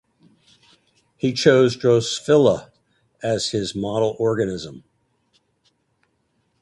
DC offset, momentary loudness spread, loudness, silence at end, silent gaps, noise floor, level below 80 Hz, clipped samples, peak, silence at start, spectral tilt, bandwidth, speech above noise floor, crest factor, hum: under 0.1%; 11 LU; -20 LUFS; 1.85 s; none; -68 dBFS; -56 dBFS; under 0.1%; 0 dBFS; 1.25 s; -5 dB/octave; 11.5 kHz; 49 dB; 22 dB; none